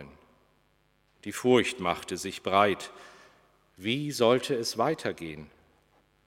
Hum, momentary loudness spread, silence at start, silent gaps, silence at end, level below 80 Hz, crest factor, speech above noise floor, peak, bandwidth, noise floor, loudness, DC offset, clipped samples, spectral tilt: none; 17 LU; 0 s; none; 0.8 s; -66 dBFS; 24 dB; 40 dB; -6 dBFS; 16 kHz; -68 dBFS; -28 LUFS; under 0.1%; under 0.1%; -4.5 dB/octave